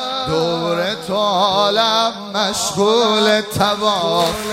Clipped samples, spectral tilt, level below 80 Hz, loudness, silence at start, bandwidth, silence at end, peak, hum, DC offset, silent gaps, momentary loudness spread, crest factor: under 0.1%; -3.5 dB/octave; -50 dBFS; -16 LUFS; 0 s; 16 kHz; 0 s; -2 dBFS; none; under 0.1%; none; 6 LU; 16 dB